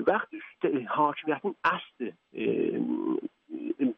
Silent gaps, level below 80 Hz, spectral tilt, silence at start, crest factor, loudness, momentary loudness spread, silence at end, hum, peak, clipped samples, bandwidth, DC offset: none; -74 dBFS; -4 dB/octave; 0 s; 18 dB; -30 LUFS; 12 LU; 0.05 s; none; -12 dBFS; under 0.1%; 6.2 kHz; under 0.1%